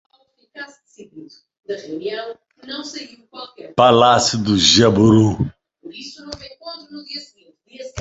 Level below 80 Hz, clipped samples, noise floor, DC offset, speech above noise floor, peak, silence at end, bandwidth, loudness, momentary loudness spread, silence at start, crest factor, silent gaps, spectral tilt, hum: -46 dBFS; under 0.1%; -45 dBFS; under 0.1%; 26 dB; 0 dBFS; 0 s; 8.2 kHz; -15 LUFS; 24 LU; 0.55 s; 20 dB; 1.59-1.63 s; -4.5 dB/octave; none